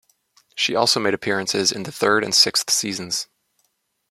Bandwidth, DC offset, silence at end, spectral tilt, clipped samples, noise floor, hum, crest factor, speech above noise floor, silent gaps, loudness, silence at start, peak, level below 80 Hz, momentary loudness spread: 16 kHz; under 0.1%; 0.85 s; -1.5 dB/octave; under 0.1%; -70 dBFS; none; 22 dB; 50 dB; none; -19 LUFS; 0.55 s; 0 dBFS; -66 dBFS; 11 LU